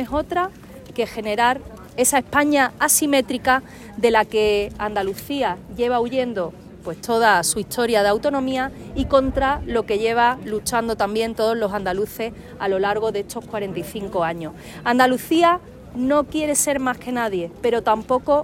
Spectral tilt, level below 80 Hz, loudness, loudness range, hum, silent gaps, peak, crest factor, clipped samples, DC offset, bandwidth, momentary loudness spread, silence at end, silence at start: -3.5 dB/octave; -44 dBFS; -21 LUFS; 4 LU; none; none; -2 dBFS; 18 dB; under 0.1%; under 0.1%; 16 kHz; 11 LU; 0 s; 0 s